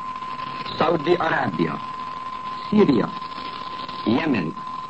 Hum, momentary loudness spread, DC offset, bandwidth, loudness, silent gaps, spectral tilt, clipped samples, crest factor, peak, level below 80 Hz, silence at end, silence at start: none; 12 LU; 0.4%; 8.4 kHz; -24 LUFS; none; -7 dB/octave; under 0.1%; 18 dB; -6 dBFS; -58 dBFS; 0 s; 0 s